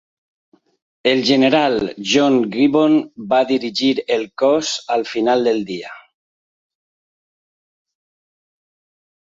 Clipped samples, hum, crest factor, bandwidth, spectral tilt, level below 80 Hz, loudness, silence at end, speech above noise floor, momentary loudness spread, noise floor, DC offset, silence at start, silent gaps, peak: under 0.1%; none; 18 dB; 7.8 kHz; -4 dB/octave; -60 dBFS; -17 LUFS; 3.2 s; over 74 dB; 8 LU; under -90 dBFS; under 0.1%; 1.05 s; none; -2 dBFS